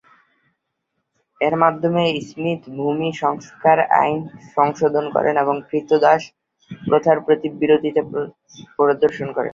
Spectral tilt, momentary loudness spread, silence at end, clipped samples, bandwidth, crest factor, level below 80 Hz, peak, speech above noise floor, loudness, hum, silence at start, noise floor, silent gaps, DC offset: -6.5 dB/octave; 9 LU; 0 s; under 0.1%; 7.4 kHz; 18 dB; -62 dBFS; -2 dBFS; 57 dB; -19 LUFS; none; 1.4 s; -75 dBFS; none; under 0.1%